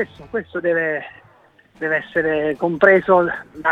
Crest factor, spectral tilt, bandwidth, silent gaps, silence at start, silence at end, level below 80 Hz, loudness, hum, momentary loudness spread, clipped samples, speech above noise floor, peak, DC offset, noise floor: 20 dB; -8 dB/octave; 6.6 kHz; none; 0 s; 0 s; -54 dBFS; -19 LUFS; none; 14 LU; under 0.1%; 34 dB; 0 dBFS; under 0.1%; -52 dBFS